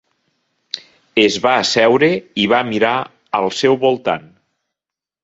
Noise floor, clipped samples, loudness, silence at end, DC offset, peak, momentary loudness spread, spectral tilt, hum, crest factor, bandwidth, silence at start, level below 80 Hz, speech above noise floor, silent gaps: -87 dBFS; under 0.1%; -15 LUFS; 1.05 s; under 0.1%; 0 dBFS; 13 LU; -4 dB/octave; none; 18 dB; 8 kHz; 0.75 s; -58 dBFS; 72 dB; none